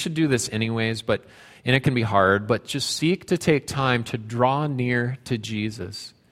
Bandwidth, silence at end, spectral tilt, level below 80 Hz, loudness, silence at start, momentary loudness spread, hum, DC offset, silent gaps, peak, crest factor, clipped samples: 15.5 kHz; 0.25 s; -5 dB/octave; -54 dBFS; -23 LUFS; 0 s; 9 LU; none; under 0.1%; none; -2 dBFS; 20 dB; under 0.1%